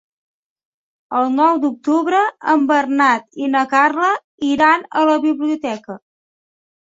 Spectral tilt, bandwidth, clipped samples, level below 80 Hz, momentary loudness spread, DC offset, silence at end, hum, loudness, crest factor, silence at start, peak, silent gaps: -4 dB/octave; 7.8 kHz; under 0.1%; -64 dBFS; 9 LU; under 0.1%; 0.85 s; none; -16 LUFS; 16 dB; 1.1 s; -2 dBFS; 4.24-4.38 s